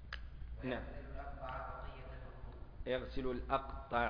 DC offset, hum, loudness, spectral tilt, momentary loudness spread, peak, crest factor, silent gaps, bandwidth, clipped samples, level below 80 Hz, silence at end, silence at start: under 0.1%; none; -44 LUFS; -4.5 dB/octave; 13 LU; -20 dBFS; 22 dB; none; 5.2 kHz; under 0.1%; -50 dBFS; 0 s; 0 s